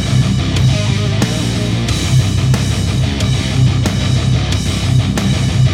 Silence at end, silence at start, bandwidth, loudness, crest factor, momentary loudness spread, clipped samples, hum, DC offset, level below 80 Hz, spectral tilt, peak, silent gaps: 0 s; 0 s; 14 kHz; -14 LUFS; 12 dB; 3 LU; under 0.1%; none; under 0.1%; -24 dBFS; -5.5 dB/octave; 0 dBFS; none